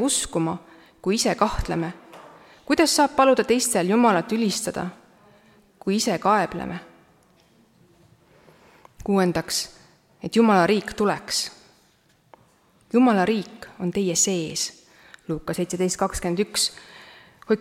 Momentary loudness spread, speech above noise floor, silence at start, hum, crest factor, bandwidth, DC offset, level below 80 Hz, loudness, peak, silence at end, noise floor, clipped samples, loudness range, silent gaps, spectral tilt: 15 LU; 39 dB; 0 s; none; 20 dB; 16.5 kHz; under 0.1%; -48 dBFS; -22 LUFS; -4 dBFS; 0 s; -61 dBFS; under 0.1%; 7 LU; none; -4 dB/octave